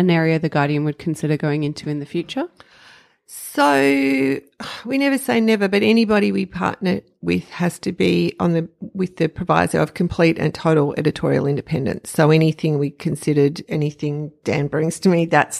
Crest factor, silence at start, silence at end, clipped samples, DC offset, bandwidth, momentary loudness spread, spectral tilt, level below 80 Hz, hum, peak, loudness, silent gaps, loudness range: 18 dB; 0 s; 0 s; under 0.1%; under 0.1%; 14 kHz; 10 LU; -6.5 dB/octave; -52 dBFS; none; -2 dBFS; -19 LUFS; none; 3 LU